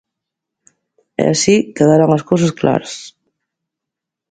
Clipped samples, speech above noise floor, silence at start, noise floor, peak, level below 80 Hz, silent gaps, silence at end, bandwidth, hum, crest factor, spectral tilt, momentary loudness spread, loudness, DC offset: under 0.1%; 69 dB; 1.2 s; -83 dBFS; 0 dBFS; -54 dBFS; none; 1.25 s; 9.6 kHz; none; 16 dB; -5.5 dB/octave; 15 LU; -14 LUFS; under 0.1%